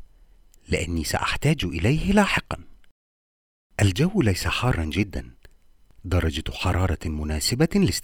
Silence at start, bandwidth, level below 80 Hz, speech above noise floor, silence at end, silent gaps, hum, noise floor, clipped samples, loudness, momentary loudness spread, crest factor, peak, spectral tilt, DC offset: 0 s; 19.5 kHz; -36 dBFS; 31 dB; 0 s; 2.91-3.70 s; none; -54 dBFS; under 0.1%; -24 LUFS; 9 LU; 20 dB; -4 dBFS; -5 dB/octave; under 0.1%